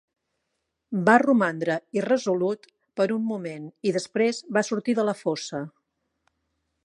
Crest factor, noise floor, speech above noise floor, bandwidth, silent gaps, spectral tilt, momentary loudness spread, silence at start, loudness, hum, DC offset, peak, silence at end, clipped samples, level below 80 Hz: 24 dB; -79 dBFS; 55 dB; 11 kHz; none; -5.5 dB/octave; 14 LU; 0.9 s; -25 LUFS; none; under 0.1%; -2 dBFS; 1.15 s; under 0.1%; -76 dBFS